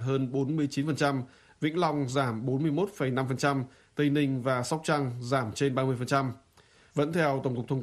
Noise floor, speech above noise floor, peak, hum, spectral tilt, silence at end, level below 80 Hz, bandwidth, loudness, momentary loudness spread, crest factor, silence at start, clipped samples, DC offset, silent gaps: -60 dBFS; 32 dB; -12 dBFS; none; -6.5 dB/octave; 0 s; -66 dBFS; 13.5 kHz; -29 LUFS; 6 LU; 18 dB; 0 s; under 0.1%; under 0.1%; none